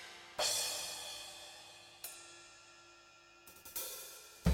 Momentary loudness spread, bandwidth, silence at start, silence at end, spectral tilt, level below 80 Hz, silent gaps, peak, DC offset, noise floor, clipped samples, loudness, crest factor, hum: 24 LU; 17 kHz; 0 s; 0 s; -3 dB/octave; -56 dBFS; none; -18 dBFS; under 0.1%; -62 dBFS; under 0.1%; -40 LUFS; 24 dB; none